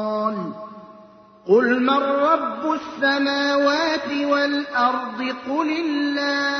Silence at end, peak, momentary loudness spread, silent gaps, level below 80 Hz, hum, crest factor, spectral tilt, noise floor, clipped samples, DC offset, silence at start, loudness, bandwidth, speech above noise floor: 0 s; -4 dBFS; 9 LU; none; -68 dBFS; none; 16 dB; -4.5 dB/octave; -47 dBFS; under 0.1%; under 0.1%; 0 s; -21 LUFS; 6.6 kHz; 27 dB